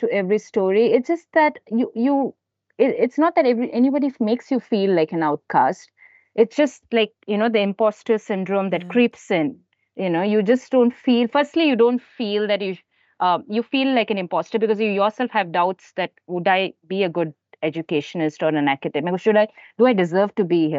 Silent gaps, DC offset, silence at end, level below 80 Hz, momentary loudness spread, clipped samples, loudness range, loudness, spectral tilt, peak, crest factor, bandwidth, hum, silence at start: none; under 0.1%; 0 s; -76 dBFS; 7 LU; under 0.1%; 3 LU; -20 LUFS; -6.5 dB/octave; -4 dBFS; 16 dB; 7.8 kHz; none; 0 s